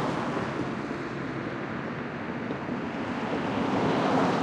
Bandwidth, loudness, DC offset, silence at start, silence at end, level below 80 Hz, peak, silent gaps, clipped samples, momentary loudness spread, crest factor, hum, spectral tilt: 10.5 kHz; -30 LUFS; under 0.1%; 0 s; 0 s; -58 dBFS; -14 dBFS; none; under 0.1%; 9 LU; 16 dB; none; -6.5 dB/octave